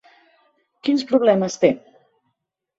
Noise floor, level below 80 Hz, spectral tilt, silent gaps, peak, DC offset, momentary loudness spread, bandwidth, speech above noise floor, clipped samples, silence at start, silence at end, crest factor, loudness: -77 dBFS; -66 dBFS; -5.5 dB/octave; none; -2 dBFS; under 0.1%; 10 LU; 8 kHz; 59 dB; under 0.1%; 0.85 s; 1 s; 20 dB; -19 LUFS